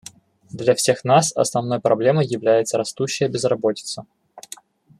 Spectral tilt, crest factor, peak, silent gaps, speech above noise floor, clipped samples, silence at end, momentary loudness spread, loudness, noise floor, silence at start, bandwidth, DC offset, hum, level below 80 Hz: -4.5 dB/octave; 18 dB; -2 dBFS; none; 26 dB; under 0.1%; 0.6 s; 21 LU; -19 LUFS; -45 dBFS; 0.55 s; 14 kHz; under 0.1%; none; -64 dBFS